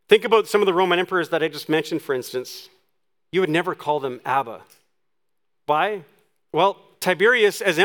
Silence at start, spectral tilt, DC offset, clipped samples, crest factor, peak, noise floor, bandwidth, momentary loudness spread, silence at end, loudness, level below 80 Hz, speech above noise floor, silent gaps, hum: 0.1 s; -4 dB/octave; under 0.1%; under 0.1%; 22 dB; 0 dBFS; -81 dBFS; 19.5 kHz; 14 LU; 0 s; -21 LUFS; -76 dBFS; 61 dB; none; none